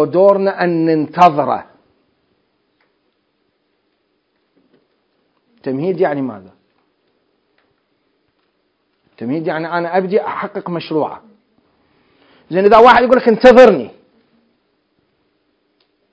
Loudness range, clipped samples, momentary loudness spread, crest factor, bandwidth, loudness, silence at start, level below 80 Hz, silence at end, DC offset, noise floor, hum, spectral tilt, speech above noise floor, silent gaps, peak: 16 LU; 0.7%; 17 LU; 16 dB; 8 kHz; -13 LUFS; 0 s; -52 dBFS; 2.2 s; under 0.1%; -65 dBFS; none; -7 dB/octave; 53 dB; none; 0 dBFS